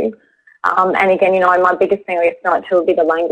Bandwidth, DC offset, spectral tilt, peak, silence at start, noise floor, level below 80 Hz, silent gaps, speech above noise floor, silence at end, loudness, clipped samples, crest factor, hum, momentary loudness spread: 8.8 kHz; under 0.1%; -6.5 dB/octave; 0 dBFS; 0 s; -48 dBFS; -56 dBFS; none; 35 dB; 0 s; -14 LUFS; under 0.1%; 14 dB; none; 5 LU